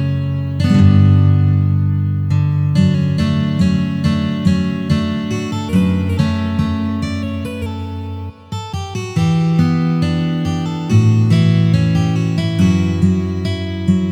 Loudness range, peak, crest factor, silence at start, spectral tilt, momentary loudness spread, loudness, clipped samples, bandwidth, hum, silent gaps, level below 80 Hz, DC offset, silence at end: 5 LU; 0 dBFS; 14 dB; 0 s; -7.5 dB/octave; 11 LU; -16 LUFS; under 0.1%; 10.5 kHz; none; none; -38 dBFS; under 0.1%; 0 s